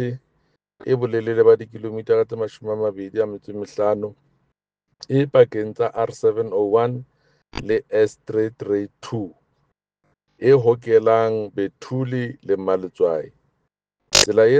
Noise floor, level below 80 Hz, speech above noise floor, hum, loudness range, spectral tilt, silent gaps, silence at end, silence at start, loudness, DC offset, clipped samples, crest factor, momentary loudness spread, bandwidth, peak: -74 dBFS; -54 dBFS; 54 dB; none; 4 LU; -4.5 dB/octave; none; 0 s; 0 s; -20 LUFS; under 0.1%; under 0.1%; 20 dB; 14 LU; 10 kHz; 0 dBFS